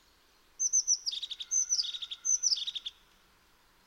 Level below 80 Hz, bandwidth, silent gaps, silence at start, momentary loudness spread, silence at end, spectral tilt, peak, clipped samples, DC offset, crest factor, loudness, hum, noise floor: -72 dBFS; 18 kHz; none; 0.6 s; 10 LU; 0.95 s; 5 dB/octave; -16 dBFS; under 0.1%; under 0.1%; 18 dB; -29 LUFS; none; -65 dBFS